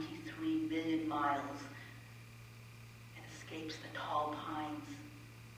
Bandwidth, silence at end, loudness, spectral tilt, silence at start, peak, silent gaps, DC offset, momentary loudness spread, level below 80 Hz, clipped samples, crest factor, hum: 16 kHz; 0 s; -40 LUFS; -5.5 dB/octave; 0 s; -22 dBFS; none; under 0.1%; 18 LU; -70 dBFS; under 0.1%; 20 dB; none